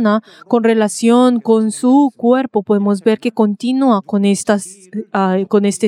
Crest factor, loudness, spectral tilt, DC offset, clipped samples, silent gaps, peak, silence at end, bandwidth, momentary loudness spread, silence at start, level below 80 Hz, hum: 14 dB; -14 LUFS; -6 dB/octave; under 0.1%; under 0.1%; none; 0 dBFS; 0 s; 13 kHz; 6 LU; 0 s; -70 dBFS; none